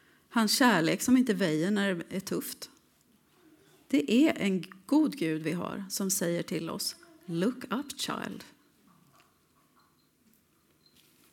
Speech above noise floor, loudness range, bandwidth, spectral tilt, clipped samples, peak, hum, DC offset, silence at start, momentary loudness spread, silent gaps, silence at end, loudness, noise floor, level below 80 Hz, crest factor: 39 dB; 10 LU; 18 kHz; -4 dB/octave; under 0.1%; -10 dBFS; none; under 0.1%; 0.3 s; 12 LU; none; 2.85 s; -29 LUFS; -68 dBFS; -74 dBFS; 22 dB